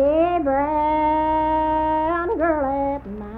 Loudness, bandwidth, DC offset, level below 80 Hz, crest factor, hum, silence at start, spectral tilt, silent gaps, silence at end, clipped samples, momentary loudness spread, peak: -21 LUFS; 4.9 kHz; under 0.1%; -40 dBFS; 12 dB; none; 0 s; -9 dB/octave; none; 0 s; under 0.1%; 4 LU; -8 dBFS